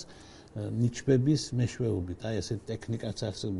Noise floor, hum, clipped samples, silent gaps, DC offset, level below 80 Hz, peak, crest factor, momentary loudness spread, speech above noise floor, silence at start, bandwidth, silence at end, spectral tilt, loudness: -51 dBFS; none; under 0.1%; none; under 0.1%; -54 dBFS; -12 dBFS; 18 dB; 13 LU; 21 dB; 0 s; 11.5 kHz; 0 s; -6.5 dB/octave; -31 LUFS